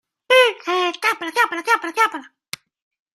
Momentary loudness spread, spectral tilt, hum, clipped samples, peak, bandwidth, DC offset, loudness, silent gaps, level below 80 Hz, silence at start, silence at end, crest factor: 21 LU; -0.5 dB/octave; none; under 0.1%; -2 dBFS; 14.5 kHz; under 0.1%; -18 LUFS; none; -76 dBFS; 0.3 s; 0.9 s; 18 dB